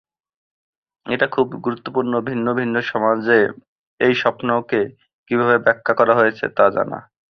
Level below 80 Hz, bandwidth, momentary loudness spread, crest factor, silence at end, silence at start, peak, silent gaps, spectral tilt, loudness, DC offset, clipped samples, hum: -62 dBFS; 6.4 kHz; 8 LU; 18 dB; 0.3 s; 1.05 s; -2 dBFS; 3.68-3.98 s, 5.13-5.24 s; -7.5 dB/octave; -18 LUFS; under 0.1%; under 0.1%; none